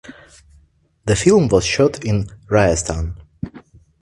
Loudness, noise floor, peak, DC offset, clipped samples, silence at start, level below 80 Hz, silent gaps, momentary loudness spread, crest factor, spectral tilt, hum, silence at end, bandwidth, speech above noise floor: -17 LUFS; -55 dBFS; 0 dBFS; under 0.1%; under 0.1%; 0.1 s; -34 dBFS; none; 18 LU; 18 dB; -5 dB/octave; none; 0.4 s; 11.5 kHz; 39 dB